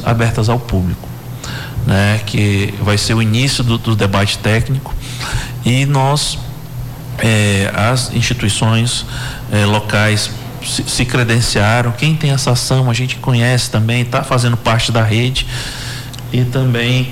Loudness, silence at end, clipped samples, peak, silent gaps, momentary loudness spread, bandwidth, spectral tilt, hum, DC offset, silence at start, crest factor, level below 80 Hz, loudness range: -14 LUFS; 0 s; under 0.1%; -6 dBFS; none; 11 LU; 16 kHz; -5 dB/octave; none; under 0.1%; 0 s; 8 dB; -32 dBFS; 2 LU